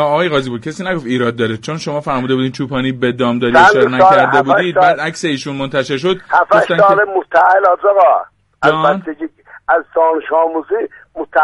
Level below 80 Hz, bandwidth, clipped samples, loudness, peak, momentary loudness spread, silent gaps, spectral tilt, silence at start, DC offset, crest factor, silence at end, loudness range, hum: -50 dBFS; 11.5 kHz; under 0.1%; -13 LUFS; 0 dBFS; 11 LU; none; -5.5 dB/octave; 0 s; under 0.1%; 12 dB; 0 s; 4 LU; none